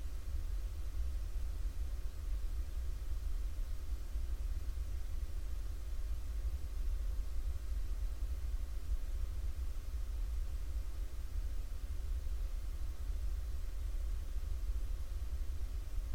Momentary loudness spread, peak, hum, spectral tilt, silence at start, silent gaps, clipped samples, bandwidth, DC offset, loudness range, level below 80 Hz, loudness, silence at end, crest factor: 3 LU; -26 dBFS; none; -5.5 dB/octave; 0 s; none; under 0.1%; 16.5 kHz; 0.5%; 1 LU; -38 dBFS; -44 LUFS; 0 s; 12 dB